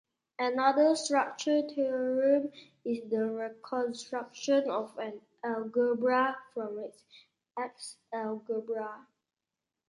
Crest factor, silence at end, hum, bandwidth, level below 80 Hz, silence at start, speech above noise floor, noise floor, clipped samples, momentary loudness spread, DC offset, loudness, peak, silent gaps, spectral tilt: 20 dB; 0.9 s; none; 11.5 kHz; -84 dBFS; 0.4 s; 59 dB; -90 dBFS; under 0.1%; 14 LU; under 0.1%; -31 LUFS; -12 dBFS; none; -3.5 dB/octave